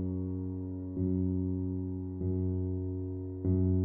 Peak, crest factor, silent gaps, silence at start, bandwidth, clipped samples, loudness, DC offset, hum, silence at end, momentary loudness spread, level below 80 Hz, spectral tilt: -18 dBFS; 14 dB; none; 0 s; 1.5 kHz; under 0.1%; -34 LUFS; under 0.1%; none; 0 s; 7 LU; -52 dBFS; -15.5 dB/octave